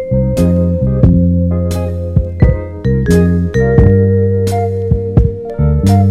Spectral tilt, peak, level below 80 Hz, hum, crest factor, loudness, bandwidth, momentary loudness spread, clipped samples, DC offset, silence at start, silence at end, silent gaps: -9 dB/octave; 0 dBFS; -20 dBFS; none; 10 dB; -12 LUFS; 13.5 kHz; 7 LU; 0.4%; under 0.1%; 0 s; 0 s; none